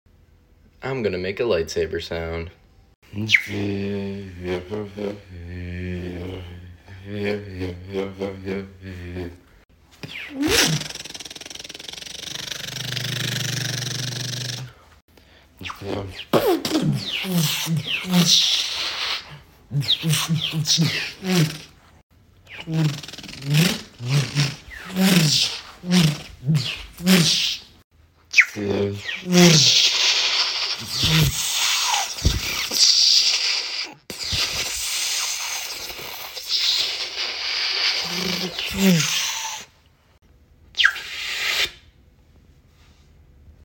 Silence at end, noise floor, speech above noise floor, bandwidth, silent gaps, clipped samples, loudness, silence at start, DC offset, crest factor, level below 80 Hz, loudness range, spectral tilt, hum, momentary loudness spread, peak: 0.15 s; -56 dBFS; 34 dB; 17 kHz; 2.95-3.02 s, 15.02-15.08 s, 22.03-22.10 s, 27.84-27.90 s; under 0.1%; -20 LUFS; 0.8 s; under 0.1%; 22 dB; -44 dBFS; 13 LU; -3 dB/octave; none; 18 LU; 0 dBFS